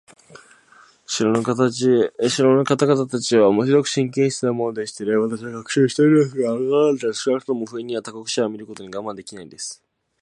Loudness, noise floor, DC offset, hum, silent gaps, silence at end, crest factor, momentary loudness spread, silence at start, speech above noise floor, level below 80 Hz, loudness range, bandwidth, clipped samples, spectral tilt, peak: -20 LUFS; -52 dBFS; under 0.1%; none; none; 0.5 s; 18 dB; 15 LU; 0.35 s; 32 dB; -66 dBFS; 5 LU; 11.5 kHz; under 0.1%; -5 dB/octave; -2 dBFS